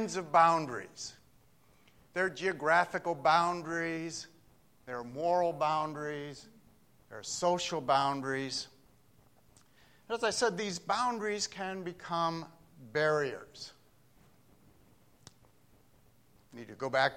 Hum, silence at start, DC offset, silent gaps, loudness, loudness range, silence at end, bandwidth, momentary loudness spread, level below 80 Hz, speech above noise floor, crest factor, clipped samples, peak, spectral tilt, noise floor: none; 0 s; under 0.1%; none; -32 LUFS; 6 LU; 0 s; 16.5 kHz; 17 LU; -72 dBFS; 34 dB; 22 dB; under 0.1%; -12 dBFS; -3.5 dB/octave; -66 dBFS